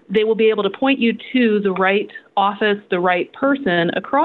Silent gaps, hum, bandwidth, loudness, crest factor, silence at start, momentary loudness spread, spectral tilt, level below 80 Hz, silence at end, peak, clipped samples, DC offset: none; none; 4.4 kHz; -18 LUFS; 14 dB; 0.1 s; 3 LU; -8.5 dB/octave; -62 dBFS; 0 s; -4 dBFS; under 0.1%; under 0.1%